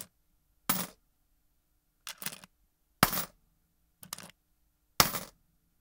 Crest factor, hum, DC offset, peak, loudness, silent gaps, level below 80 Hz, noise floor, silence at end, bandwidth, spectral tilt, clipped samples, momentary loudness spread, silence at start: 34 dB; none; under 0.1%; -4 dBFS; -31 LUFS; none; -60 dBFS; -74 dBFS; 0.55 s; 17.5 kHz; -2 dB/octave; under 0.1%; 21 LU; 0 s